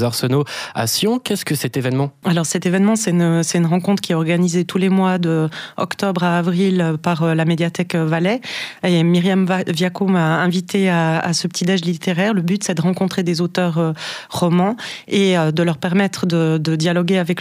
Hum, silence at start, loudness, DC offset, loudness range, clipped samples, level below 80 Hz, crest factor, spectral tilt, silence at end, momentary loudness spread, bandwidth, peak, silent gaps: none; 0 s; -18 LUFS; under 0.1%; 2 LU; under 0.1%; -62 dBFS; 12 dB; -5.5 dB/octave; 0 s; 5 LU; 16 kHz; -6 dBFS; none